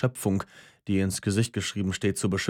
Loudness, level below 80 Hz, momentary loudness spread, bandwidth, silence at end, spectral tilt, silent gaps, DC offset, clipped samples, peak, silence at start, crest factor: -28 LUFS; -58 dBFS; 5 LU; 17 kHz; 0 s; -5 dB/octave; none; under 0.1%; under 0.1%; -10 dBFS; 0 s; 18 dB